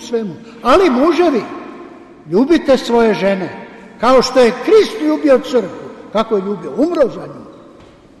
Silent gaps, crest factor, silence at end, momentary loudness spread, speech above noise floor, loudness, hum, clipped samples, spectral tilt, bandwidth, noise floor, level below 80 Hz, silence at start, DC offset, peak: none; 12 dB; 0.7 s; 17 LU; 29 dB; -14 LUFS; none; under 0.1%; -5.5 dB/octave; 12.5 kHz; -42 dBFS; -44 dBFS; 0 s; under 0.1%; -2 dBFS